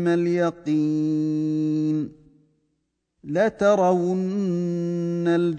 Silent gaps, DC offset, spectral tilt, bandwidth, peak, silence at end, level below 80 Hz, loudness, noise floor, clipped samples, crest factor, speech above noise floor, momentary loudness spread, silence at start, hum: none; under 0.1%; -8 dB/octave; 9 kHz; -6 dBFS; 0 s; -64 dBFS; -23 LUFS; -75 dBFS; under 0.1%; 16 dB; 53 dB; 6 LU; 0 s; none